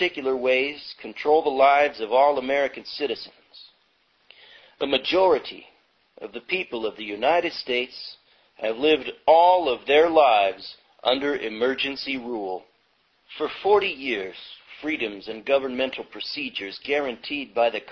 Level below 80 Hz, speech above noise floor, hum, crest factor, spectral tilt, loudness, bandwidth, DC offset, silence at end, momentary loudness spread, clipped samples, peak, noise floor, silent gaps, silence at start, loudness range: -62 dBFS; 43 dB; none; 20 dB; -4.5 dB/octave; -23 LUFS; 6.6 kHz; under 0.1%; 0 s; 18 LU; under 0.1%; -4 dBFS; -66 dBFS; none; 0 s; 7 LU